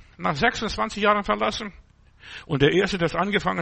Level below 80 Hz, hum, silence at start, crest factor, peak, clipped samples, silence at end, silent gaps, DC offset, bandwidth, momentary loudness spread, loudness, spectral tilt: -46 dBFS; none; 0.2 s; 18 dB; -6 dBFS; under 0.1%; 0 s; none; under 0.1%; 8.8 kHz; 13 LU; -23 LUFS; -5 dB/octave